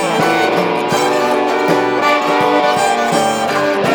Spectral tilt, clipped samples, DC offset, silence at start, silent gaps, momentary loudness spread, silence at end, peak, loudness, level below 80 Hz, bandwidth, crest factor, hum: -4 dB/octave; under 0.1%; under 0.1%; 0 s; none; 2 LU; 0 s; 0 dBFS; -14 LUFS; -60 dBFS; over 20 kHz; 14 dB; none